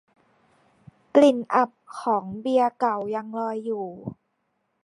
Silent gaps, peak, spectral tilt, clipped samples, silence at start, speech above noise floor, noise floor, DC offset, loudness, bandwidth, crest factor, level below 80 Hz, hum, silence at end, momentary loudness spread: none; -4 dBFS; -6 dB/octave; under 0.1%; 1.15 s; 51 dB; -74 dBFS; under 0.1%; -24 LUFS; 11.5 kHz; 22 dB; -70 dBFS; none; 0.75 s; 13 LU